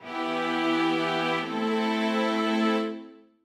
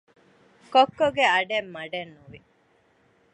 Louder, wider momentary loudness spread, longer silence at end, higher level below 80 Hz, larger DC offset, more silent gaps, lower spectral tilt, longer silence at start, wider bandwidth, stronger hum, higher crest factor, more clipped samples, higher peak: second, -26 LUFS vs -23 LUFS; second, 4 LU vs 14 LU; second, 0.25 s vs 0.95 s; second, -84 dBFS vs -66 dBFS; neither; neither; first, -5 dB/octave vs -3.5 dB/octave; second, 0 s vs 0.7 s; first, 13.5 kHz vs 8.8 kHz; neither; second, 12 dB vs 20 dB; neither; second, -14 dBFS vs -6 dBFS